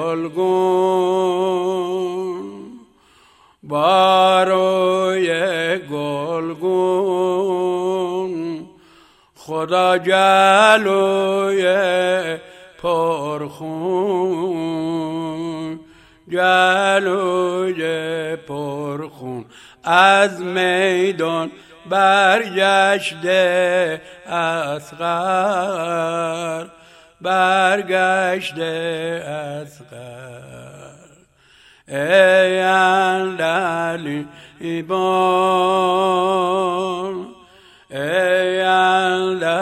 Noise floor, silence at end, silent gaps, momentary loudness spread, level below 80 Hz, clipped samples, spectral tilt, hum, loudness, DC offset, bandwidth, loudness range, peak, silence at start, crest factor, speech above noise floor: -52 dBFS; 0 s; none; 15 LU; -64 dBFS; under 0.1%; -4.5 dB/octave; none; -17 LUFS; under 0.1%; 13.5 kHz; 6 LU; 0 dBFS; 0 s; 18 dB; 35 dB